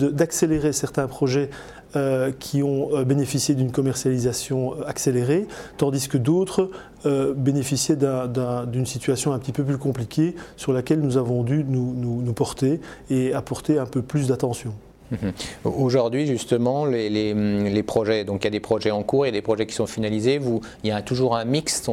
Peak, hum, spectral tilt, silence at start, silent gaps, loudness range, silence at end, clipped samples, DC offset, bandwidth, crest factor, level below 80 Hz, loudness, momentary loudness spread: -6 dBFS; none; -6 dB/octave; 0 s; none; 2 LU; 0 s; under 0.1%; under 0.1%; 16.5 kHz; 16 dB; -50 dBFS; -23 LUFS; 6 LU